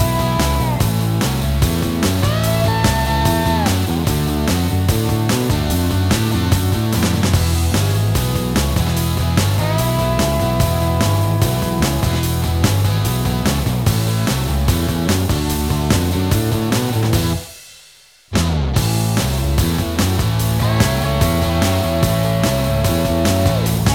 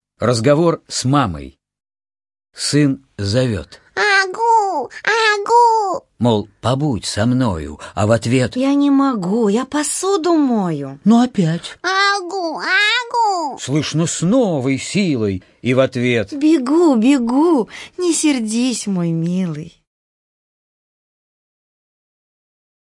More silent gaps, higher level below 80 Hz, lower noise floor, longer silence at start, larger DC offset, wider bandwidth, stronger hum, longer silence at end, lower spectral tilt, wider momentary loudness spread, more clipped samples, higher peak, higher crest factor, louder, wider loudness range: neither; first, -26 dBFS vs -50 dBFS; second, -47 dBFS vs under -90 dBFS; second, 0 s vs 0.2 s; neither; first, 20 kHz vs 11.5 kHz; neither; second, 0 s vs 3.15 s; about the same, -5.5 dB/octave vs -5 dB/octave; second, 2 LU vs 8 LU; neither; about the same, 0 dBFS vs 0 dBFS; about the same, 16 dB vs 16 dB; about the same, -17 LUFS vs -16 LUFS; second, 2 LU vs 5 LU